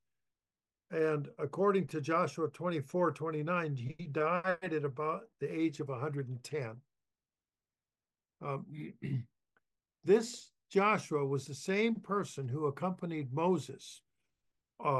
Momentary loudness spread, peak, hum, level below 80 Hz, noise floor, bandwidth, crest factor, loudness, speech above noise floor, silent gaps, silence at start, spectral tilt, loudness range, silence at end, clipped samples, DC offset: 11 LU; -16 dBFS; none; -80 dBFS; under -90 dBFS; 12 kHz; 20 dB; -35 LUFS; over 56 dB; none; 0.9 s; -6.5 dB/octave; 10 LU; 0 s; under 0.1%; under 0.1%